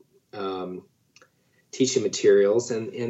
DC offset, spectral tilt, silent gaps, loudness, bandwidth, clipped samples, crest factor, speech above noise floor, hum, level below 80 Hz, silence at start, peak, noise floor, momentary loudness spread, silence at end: under 0.1%; -4 dB/octave; none; -23 LUFS; 8.2 kHz; under 0.1%; 18 dB; 40 dB; none; -82 dBFS; 0.35 s; -8 dBFS; -63 dBFS; 23 LU; 0 s